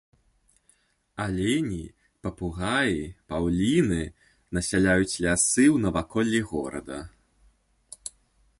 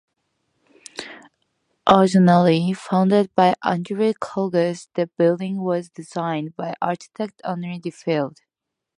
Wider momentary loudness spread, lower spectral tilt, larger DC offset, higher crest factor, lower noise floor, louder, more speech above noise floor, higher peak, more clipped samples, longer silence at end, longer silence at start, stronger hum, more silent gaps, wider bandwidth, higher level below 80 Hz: about the same, 18 LU vs 16 LU; second, -4.5 dB/octave vs -7 dB/octave; neither; about the same, 18 dB vs 20 dB; second, -66 dBFS vs -84 dBFS; second, -25 LUFS vs -20 LUFS; second, 41 dB vs 64 dB; second, -8 dBFS vs 0 dBFS; neither; first, 1.5 s vs 0.7 s; first, 1.15 s vs 0.95 s; neither; neither; about the same, 11.5 kHz vs 10.5 kHz; first, -46 dBFS vs -62 dBFS